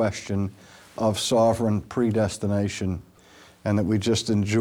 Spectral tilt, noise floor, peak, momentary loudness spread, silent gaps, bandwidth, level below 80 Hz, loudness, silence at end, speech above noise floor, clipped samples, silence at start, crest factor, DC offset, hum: -5.5 dB/octave; -52 dBFS; -10 dBFS; 10 LU; none; 16 kHz; -52 dBFS; -24 LUFS; 0 s; 28 dB; under 0.1%; 0 s; 14 dB; under 0.1%; none